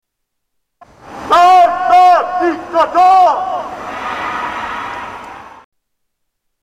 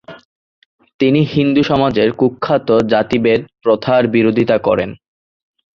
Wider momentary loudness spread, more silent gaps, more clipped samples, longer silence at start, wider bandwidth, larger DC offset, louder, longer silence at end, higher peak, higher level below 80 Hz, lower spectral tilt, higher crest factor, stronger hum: first, 18 LU vs 4 LU; second, none vs 0.25-0.79 s, 0.94-0.99 s; neither; first, 1.05 s vs 0.1 s; first, 11 kHz vs 7.2 kHz; neither; about the same, -12 LUFS vs -14 LUFS; first, 1.15 s vs 0.85 s; about the same, -2 dBFS vs -2 dBFS; about the same, -50 dBFS vs -48 dBFS; second, -3.5 dB/octave vs -8 dB/octave; about the same, 12 dB vs 14 dB; neither